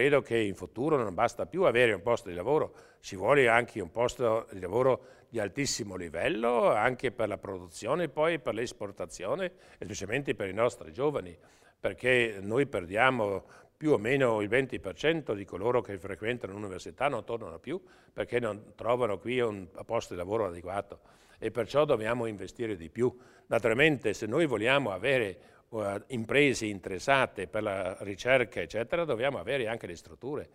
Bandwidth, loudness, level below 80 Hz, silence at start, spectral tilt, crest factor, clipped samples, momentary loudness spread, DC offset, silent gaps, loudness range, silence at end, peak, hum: 14.5 kHz; -30 LUFS; -60 dBFS; 0 s; -5 dB/octave; 24 dB; under 0.1%; 13 LU; under 0.1%; none; 5 LU; 0.1 s; -6 dBFS; none